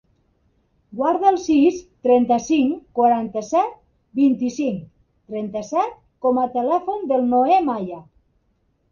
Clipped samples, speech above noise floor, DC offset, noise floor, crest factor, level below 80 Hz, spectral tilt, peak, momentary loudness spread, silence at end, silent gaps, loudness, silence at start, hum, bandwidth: under 0.1%; 47 dB; under 0.1%; -66 dBFS; 16 dB; -58 dBFS; -6 dB/octave; -4 dBFS; 11 LU; 0.9 s; none; -20 LUFS; 0.9 s; none; 7.2 kHz